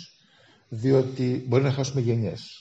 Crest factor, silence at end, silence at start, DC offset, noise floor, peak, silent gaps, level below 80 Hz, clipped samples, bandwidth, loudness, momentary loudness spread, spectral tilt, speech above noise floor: 18 dB; 0 s; 0 s; under 0.1%; -58 dBFS; -8 dBFS; none; -62 dBFS; under 0.1%; 8 kHz; -25 LUFS; 7 LU; -7 dB/octave; 34 dB